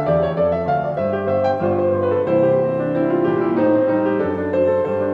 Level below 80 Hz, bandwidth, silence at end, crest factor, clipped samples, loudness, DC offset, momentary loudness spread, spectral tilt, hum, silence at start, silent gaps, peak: -50 dBFS; 5.2 kHz; 0 s; 12 dB; under 0.1%; -18 LUFS; under 0.1%; 4 LU; -10 dB/octave; none; 0 s; none; -6 dBFS